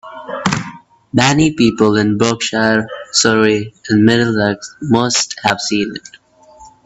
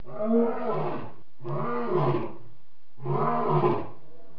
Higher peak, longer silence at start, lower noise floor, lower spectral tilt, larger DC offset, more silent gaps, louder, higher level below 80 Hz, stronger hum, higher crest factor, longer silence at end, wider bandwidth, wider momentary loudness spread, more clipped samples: first, 0 dBFS vs -12 dBFS; about the same, 0.05 s vs 0.05 s; second, -42 dBFS vs -61 dBFS; second, -4 dB/octave vs -10.5 dB/octave; second, under 0.1% vs 3%; neither; first, -14 LUFS vs -28 LUFS; first, -48 dBFS vs -66 dBFS; neither; about the same, 16 dB vs 16 dB; second, 0.2 s vs 0.45 s; first, 8.4 kHz vs 5.4 kHz; second, 9 LU vs 15 LU; neither